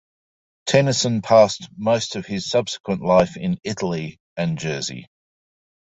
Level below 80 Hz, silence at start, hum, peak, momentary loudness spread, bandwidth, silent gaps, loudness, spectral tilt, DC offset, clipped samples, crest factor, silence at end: -54 dBFS; 0.65 s; none; -2 dBFS; 13 LU; 8.2 kHz; 2.80-2.84 s, 4.20-4.36 s; -21 LUFS; -5 dB/octave; under 0.1%; under 0.1%; 20 dB; 0.8 s